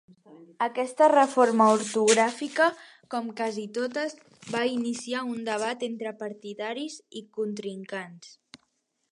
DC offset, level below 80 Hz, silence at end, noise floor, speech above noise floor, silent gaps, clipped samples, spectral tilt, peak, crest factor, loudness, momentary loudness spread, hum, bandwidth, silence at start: under 0.1%; -82 dBFS; 0.85 s; -75 dBFS; 48 dB; none; under 0.1%; -3.5 dB/octave; -6 dBFS; 20 dB; -26 LUFS; 17 LU; none; 11.5 kHz; 0.3 s